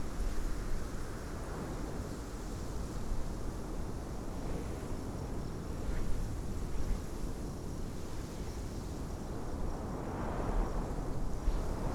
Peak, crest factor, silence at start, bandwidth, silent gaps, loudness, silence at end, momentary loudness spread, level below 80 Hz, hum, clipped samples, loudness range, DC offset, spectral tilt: -20 dBFS; 16 dB; 0 s; 15 kHz; none; -41 LUFS; 0 s; 4 LU; -38 dBFS; none; under 0.1%; 2 LU; under 0.1%; -6 dB/octave